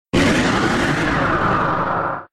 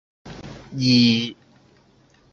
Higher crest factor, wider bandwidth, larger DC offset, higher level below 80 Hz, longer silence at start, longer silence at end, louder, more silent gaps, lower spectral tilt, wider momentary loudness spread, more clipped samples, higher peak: second, 12 dB vs 18 dB; first, 14 kHz vs 7.2 kHz; neither; first, -36 dBFS vs -54 dBFS; about the same, 0.15 s vs 0.25 s; second, 0.05 s vs 1 s; about the same, -18 LUFS vs -18 LUFS; neither; about the same, -5 dB/octave vs -5 dB/octave; second, 4 LU vs 24 LU; neither; about the same, -6 dBFS vs -4 dBFS